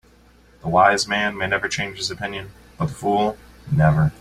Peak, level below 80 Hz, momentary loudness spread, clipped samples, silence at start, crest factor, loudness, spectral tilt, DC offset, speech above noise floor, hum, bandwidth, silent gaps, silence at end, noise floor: -2 dBFS; -44 dBFS; 15 LU; under 0.1%; 0.65 s; 18 dB; -21 LUFS; -5 dB/octave; under 0.1%; 32 dB; 60 Hz at -45 dBFS; 12.5 kHz; none; 0.1 s; -52 dBFS